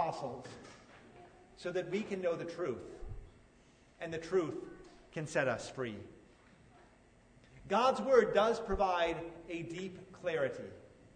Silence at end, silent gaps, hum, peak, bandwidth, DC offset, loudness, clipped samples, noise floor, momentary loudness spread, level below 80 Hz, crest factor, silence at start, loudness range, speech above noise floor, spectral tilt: 0.1 s; none; none; -14 dBFS; 9.6 kHz; under 0.1%; -35 LUFS; under 0.1%; -64 dBFS; 21 LU; -58 dBFS; 22 dB; 0 s; 8 LU; 29 dB; -5 dB/octave